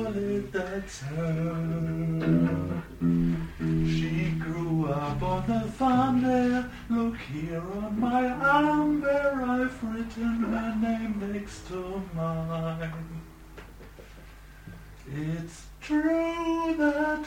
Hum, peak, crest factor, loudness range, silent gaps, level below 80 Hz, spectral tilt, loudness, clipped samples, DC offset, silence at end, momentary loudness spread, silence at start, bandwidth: none; -10 dBFS; 18 dB; 10 LU; none; -46 dBFS; -7.5 dB/octave; -28 LUFS; under 0.1%; under 0.1%; 0 s; 16 LU; 0 s; 15.5 kHz